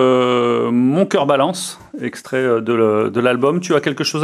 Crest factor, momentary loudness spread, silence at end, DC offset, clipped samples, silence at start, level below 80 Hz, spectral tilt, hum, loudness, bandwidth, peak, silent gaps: 16 dB; 11 LU; 0 s; under 0.1%; under 0.1%; 0 s; -66 dBFS; -5.5 dB/octave; none; -16 LUFS; 15 kHz; 0 dBFS; none